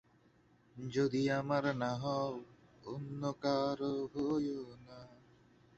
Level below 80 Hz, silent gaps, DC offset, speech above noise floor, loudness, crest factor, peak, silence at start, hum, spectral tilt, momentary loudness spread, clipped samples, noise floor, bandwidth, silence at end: -70 dBFS; none; under 0.1%; 32 dB; -37 LUFS; 18 dB; -20 dBFS; 0.75 s; none; -6.5 dB/octave; 17 LU; under 0.1%; -68 dBFS; 8 kHz; 0.65 s